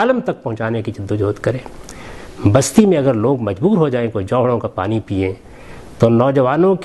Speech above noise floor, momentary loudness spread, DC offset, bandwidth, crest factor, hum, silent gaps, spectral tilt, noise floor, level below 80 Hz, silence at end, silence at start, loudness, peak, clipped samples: 20 dB; 14 LU; under 0.1%; 12.5 kHz; 16 dB; none; none; -6.5 dB/octave; -36 dBFS; -44 dBFS; 0 s; 0 s; -16 LUFS; 0 dBFS; under 0.1%